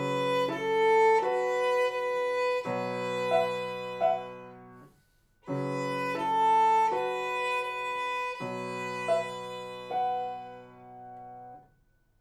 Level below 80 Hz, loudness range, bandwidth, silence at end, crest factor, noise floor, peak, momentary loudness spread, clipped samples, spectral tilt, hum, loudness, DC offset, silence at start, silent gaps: -70 dBFS; 7 LU; 14.5 kHz; 0.6 s; 14 dB; -67 dBFS; -14 dBFS; 22 LU; under 0.1%; -5 dB/octave; none; -29 LUFS; under 0.1%; 0 s; none